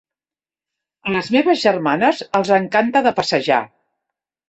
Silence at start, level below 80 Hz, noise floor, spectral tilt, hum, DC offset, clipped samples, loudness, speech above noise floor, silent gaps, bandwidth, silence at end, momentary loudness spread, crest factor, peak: 1.05 s; -60 dBFS; under -90 dBFS; -5 dB/octave; none; under 0.1%; under 0.1%; -17 LUFS; over 73 dB; none; 8.4 kHz; 0.85 s; 7 LU; 18 dB; -2 dBFS